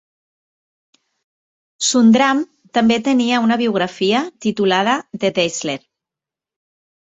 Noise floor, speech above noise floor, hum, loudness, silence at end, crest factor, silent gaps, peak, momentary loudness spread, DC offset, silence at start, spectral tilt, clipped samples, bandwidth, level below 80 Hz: -87 dBFS; 72 dB; none; -16 LUFS; 1.25 s; 18 dB; none; -2 dBFS; 10 LU; under 0.1%; 1.8 s; -4 dB/octave; under 0.1%; 8.2 kHz; -62 dBFS